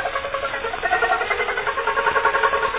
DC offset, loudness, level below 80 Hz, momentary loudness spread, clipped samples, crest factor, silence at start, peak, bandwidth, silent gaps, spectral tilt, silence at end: under 0.1%; -21 LUFS; -46 dBFS; 6 LU; under 0.1%; 16 dB; 0 s; -6 dBFS; 4 kHz; none; -6 dB/octave; 0 s